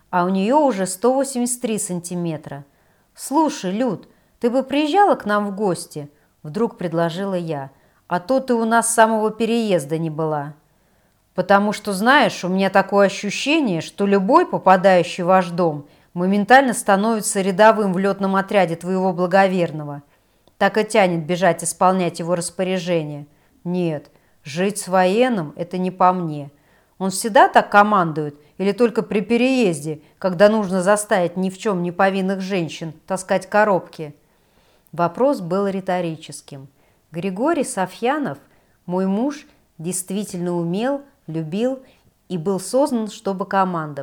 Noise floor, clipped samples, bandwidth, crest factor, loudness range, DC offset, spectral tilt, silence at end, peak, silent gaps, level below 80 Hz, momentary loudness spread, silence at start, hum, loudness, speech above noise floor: -60 dBFS; under 0.1%; 18.5 kHz; 18 dB; 7 LU; under 0.1%; -5 dB/octave; 0 s; 0 dBFS; none; -64 dBFS; 15 LU; 0.1 s; none; -19 LUFS; 41 dB